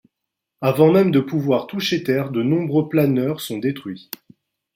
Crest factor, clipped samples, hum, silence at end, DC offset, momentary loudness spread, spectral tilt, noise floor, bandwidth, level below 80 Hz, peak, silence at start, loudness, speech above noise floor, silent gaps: 18 dB; under 0.1%; none; 0.75 s; under 0.1%; 17 LU; -7 dB/octave; -82 dBFS; 16.5 kHz; -62 dBFS; -2 dBFS; 0.6 s; -19 LUFS; 63 dB; none